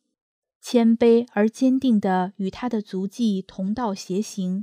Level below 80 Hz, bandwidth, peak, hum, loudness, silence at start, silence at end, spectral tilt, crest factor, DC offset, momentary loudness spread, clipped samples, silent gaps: -60 dBFS; 14.5 kHz; -6 dBFS; none; -22 LUFS; 0.65 s; 0 s; -6.5 dB/octave; 16 dB; under 0.1%; 10 LU; under 0.1%; none